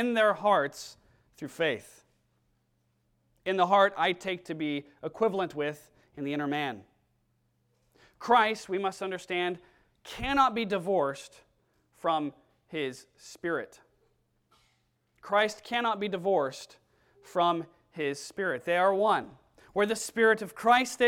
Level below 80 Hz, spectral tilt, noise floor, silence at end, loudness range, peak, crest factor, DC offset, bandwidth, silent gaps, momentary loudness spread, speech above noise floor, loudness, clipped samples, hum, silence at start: -62 dBFS; -4 dB/octave; -74 dBFS; 0 s; 6 LU; -10 dBFS; 20 dB; under 0.1%; 17 kHz; none; 19 LU; 45 dB; -29 LUFS; under 0.1%; none; 0 s